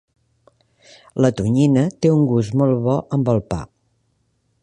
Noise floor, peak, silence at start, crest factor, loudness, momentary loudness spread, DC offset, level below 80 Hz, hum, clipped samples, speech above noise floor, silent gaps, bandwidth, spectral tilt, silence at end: -66 dBFS; -2 dBFS; 1.15 s; 18 dB; -18 LUFS; 8 LU; under 0.1%; -46 dBFS; none; under 0.1%; 49 dB; none; 10 kHz; -8 dB/octave; 0.95 s